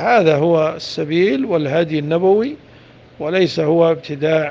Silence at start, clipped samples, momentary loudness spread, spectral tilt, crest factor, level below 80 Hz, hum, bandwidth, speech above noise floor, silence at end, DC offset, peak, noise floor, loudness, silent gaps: 0 s; under 0.1%; 8 LU; -7 dB/octave; 16 dB; -58 dBFS; none; 7.6 kHz; 28 dB; 0 s; under 0.1%; 0 dBFS; -44 dBFS; -16 LUFS; none